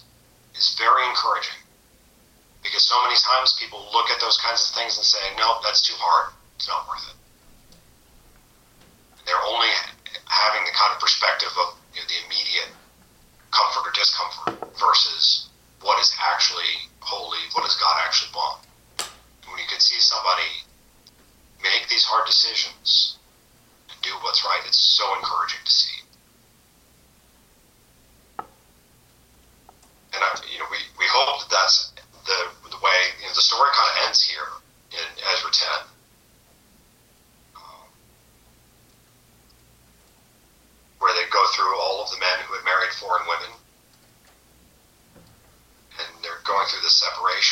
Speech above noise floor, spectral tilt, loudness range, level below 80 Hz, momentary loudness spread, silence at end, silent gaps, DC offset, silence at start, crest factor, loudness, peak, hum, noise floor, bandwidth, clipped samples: 35 dB; 1.5 dB/octave; 9 LU; -62 dBFS; 15 LU; 0 s; none; under 0.1%; 0.55 s; 18 dB; -20 LUFS; -6 dBFS; none; -57 dBFS; 16 kHz; under 0.1%